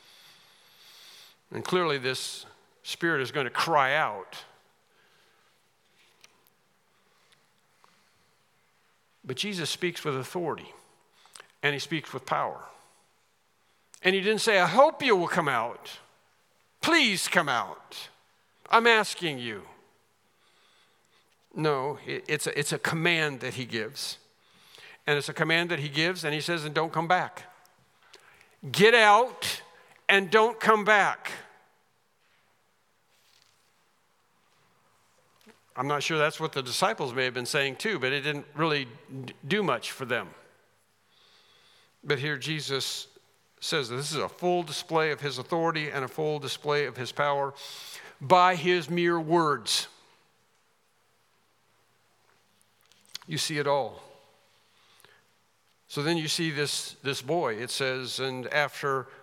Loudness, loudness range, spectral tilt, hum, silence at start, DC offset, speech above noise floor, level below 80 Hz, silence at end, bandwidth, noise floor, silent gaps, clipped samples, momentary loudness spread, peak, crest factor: -27 LUFS; 10 LU; -3.5 dB/octave; none; 1.05 s; under 0.1%; 43 dB; -82 dBFS; 0.05 s; 17 kHz; -70 dBFS; none; under 0.1%; 18 LU; -4 dBFS; 26 dB